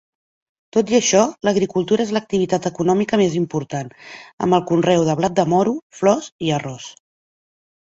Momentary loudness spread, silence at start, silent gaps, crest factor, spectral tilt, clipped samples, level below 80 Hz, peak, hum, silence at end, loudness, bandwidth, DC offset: 12 LU; 0.75 s; 4.33-4.38 s, 5.82-5.90 s, 6.32-6.39 s; 18 dB; -5 dB/octave; under 0.1%; -56 dBFS; -2 dBFS; none; 1 s; -19 LUFS; 8 kHz; under 0.1%